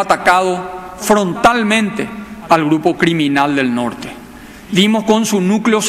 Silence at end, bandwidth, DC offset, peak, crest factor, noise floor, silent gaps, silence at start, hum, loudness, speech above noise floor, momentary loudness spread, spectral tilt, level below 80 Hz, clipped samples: 0 s; 15.5 kHz; under 0.1%; 0 dBFS; 14 dB; -35 dBFS; none; 0 s; none; -14 LUFS; 21 dB; 13 LU; -4.5 dB/octave; -46 dBFS; under 0.1%